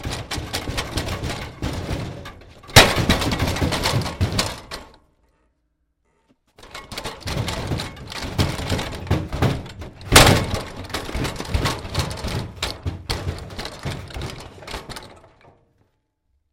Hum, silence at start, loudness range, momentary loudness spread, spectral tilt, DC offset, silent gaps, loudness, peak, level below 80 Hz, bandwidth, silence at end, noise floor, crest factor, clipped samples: none; 0 s; 12 LU; 20 LU; -3.5 dB/octave; under 0.1%; none; -22 LUFS; 0 dBFS; -34 dBFS; 16.5 kHz; 1.35 s; -70 dBFS; 24 dB; under 0.1%